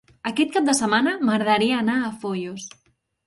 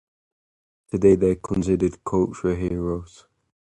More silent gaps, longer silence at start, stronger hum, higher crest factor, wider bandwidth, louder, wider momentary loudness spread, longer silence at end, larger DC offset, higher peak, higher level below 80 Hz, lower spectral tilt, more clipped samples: neither; second, 0.25 s vs 0.95 s; neither; about the same, 18 dB vs 20 dB; about the same, 11.5 kHz vs 10.5 kHz; about the same, -21 LUFS vs -22 LUFS; about the same, 12 LU vs 11 LU; about the same, 0.6 s vs 0.7 s; neither; about the same, -6 dBFS vs -4 dBFS; second, -64 dBFS vs -42 dBFS; second, -3.5 dB/octave vs -8.5 dB/octave; neither